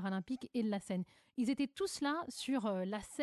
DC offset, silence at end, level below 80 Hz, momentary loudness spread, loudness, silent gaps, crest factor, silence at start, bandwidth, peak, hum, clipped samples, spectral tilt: under 0.1%; 0 s; -72 dBFS; 5 LU; -39 LUFS; none; 14 dB; 0 s; 12 kHz; -26 dBFS; none; under 0.1%; -5 dB/octave